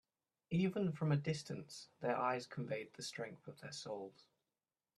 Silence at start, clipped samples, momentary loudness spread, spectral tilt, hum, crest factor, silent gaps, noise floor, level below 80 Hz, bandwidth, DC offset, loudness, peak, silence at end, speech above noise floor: 0.5 s; under 0.1%; 12 LU; -6 dB/octave; none; 20 dB; none; under -90 dBFS; -78 dBFS; 12.5 kHz; under 0.1%; -42 LUFS; -24 dBFS; 0.85 s; over 49 dB